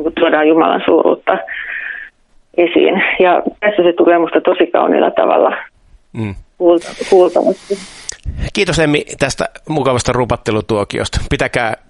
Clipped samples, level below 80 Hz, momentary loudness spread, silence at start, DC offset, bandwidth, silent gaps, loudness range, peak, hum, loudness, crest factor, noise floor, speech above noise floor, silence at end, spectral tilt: under 0.1%; -34 dBFS; 13 LU; 0 s; under 0.1%; 11.5 kHz; none; 4 LU; 0 dBFS; none; -14 LUFS; 14 dB; -45 dBFS; 32 dB; 0.15 s; -5 dB/octave